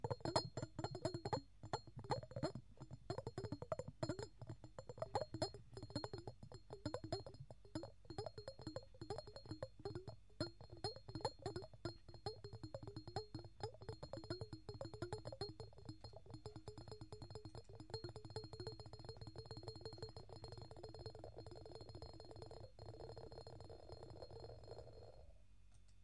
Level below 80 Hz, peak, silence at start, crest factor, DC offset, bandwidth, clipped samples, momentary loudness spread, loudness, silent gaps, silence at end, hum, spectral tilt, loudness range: -66 dBFS; -24 dBFS; 0 s; 28 dB; under 0.1%; 11.5 kHz; under 0.1%; 11 LU; -52 LUFS; none; 0 s; none; -5.5 dB/octave; 8 LU